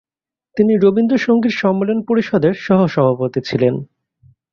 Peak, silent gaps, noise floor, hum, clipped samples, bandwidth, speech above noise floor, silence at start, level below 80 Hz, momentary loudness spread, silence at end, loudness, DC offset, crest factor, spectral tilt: -2 dBFS; none; -90 dBFS; none; under 0.1%; 7 kHz; 75 dB; 0.55 s; -54 dBFS; 6 LU; 0.7 s; -15 LUFS; under 0.1%; 14 dB; -8 dB/octave